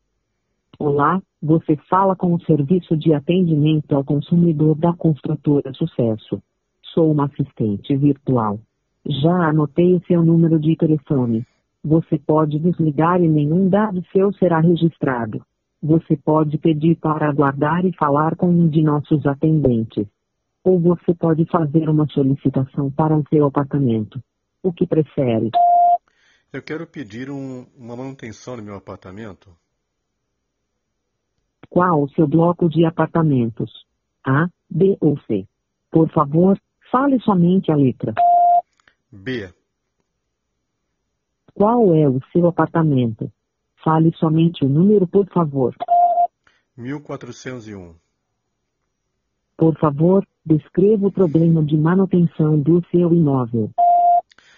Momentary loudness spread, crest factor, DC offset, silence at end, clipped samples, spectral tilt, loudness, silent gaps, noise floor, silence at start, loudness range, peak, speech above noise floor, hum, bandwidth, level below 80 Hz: 15 LU; 16 dB; under 0.1%; 0.35 s; under 0.1%; -8.5 dB/octave; -17 LUFS; none; -75 dBFS; 0.8 s; 7 LU; -2 dBFS; 58 dB; none; 6.6 kHz; -54 dBFS